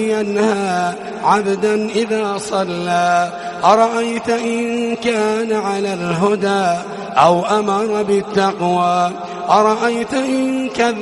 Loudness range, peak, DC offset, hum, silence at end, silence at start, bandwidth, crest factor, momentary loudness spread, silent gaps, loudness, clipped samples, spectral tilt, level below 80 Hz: 2 LU; 0 dBFS; under 0.1%; none; 0 s; 0 s; 11.5 kHz; 16 dB; 7 LU; none; -16 LUFS; under 0.1%; -5 dB/octave; -56 dBFS